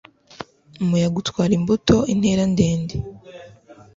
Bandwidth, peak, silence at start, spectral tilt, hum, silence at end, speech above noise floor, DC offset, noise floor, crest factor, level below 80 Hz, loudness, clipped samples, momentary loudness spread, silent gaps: 7.8 kHz; -2 dBFS; 0.4 s; -6.5 dB/octave; none; 0.25 s; 28 dB; under 0.1%; -46 dBFS; 18 dB; -42 dBFS; -20 LUFS; under 0.1%; 21 LU; none